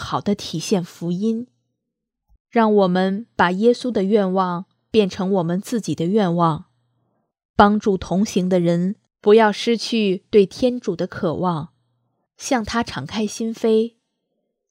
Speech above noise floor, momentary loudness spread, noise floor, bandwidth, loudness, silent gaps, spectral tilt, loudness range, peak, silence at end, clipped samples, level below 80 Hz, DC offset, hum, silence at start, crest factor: 62 dB; 10 LU; -80 dBFS; 15 kHz; -20 LUFS; 2.40-2.45 s, 7.45-7.54 s; -6 dB/octave; 5 LU; 0 dBFS; 0.8 s; under 0.1%; -50 dBFS; under 0.1%; none; 0 s; 20 dB